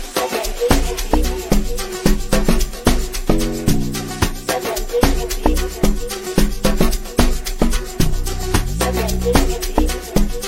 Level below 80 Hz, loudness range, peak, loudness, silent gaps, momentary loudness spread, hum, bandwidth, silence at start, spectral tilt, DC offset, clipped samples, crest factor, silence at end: -20 dBFS; 1 LU; 0 dBFS; -20 LUFS; none; 4 LU; none; 16.5 kHz; 0 s; -4.5 dB/octave; 0.5%; under 0.1%; 16 dB; 0 s